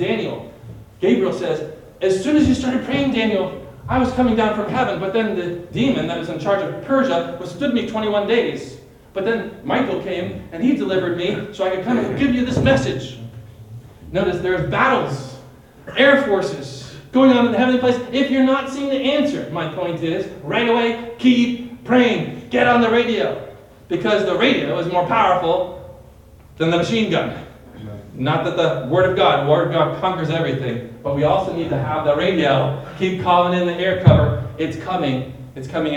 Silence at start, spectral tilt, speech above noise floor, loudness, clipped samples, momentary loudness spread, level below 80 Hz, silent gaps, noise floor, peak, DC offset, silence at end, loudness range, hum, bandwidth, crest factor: 0 s; -6.5 dB/octave; 26 dB; -19 LUFS; under 0.1%; 13 LU; -46 dBFS; none; -44 dBFS; 0 dBFS; under 0.1%; 0 s; 4 LU; none; 10.5 kHz; 18 dB